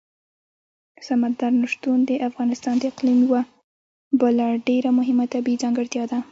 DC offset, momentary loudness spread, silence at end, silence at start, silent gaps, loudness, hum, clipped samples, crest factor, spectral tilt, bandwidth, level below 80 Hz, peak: under 0.1%; 6 LU; 0.1 s; 1 s; 3.64-4.11 s; -21 LUFS; none; under 0.1%; 14 dB; -5 dB/octave; 7.8 kHz; -70 dBFS; -6 dBFS